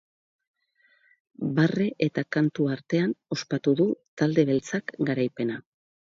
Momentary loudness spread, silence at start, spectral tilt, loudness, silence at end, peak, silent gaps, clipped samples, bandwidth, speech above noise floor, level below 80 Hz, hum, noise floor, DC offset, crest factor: 8 LU; 1.4 s; -7 dB/octave; -26 LUFS; 0.55 s; -8 dBFS; 4.08-4.17 s; under 0.1%; 7.8 kHz; 40 dB; -70 dBFS; none; -66 dBFS; under 0.1%; 18 dB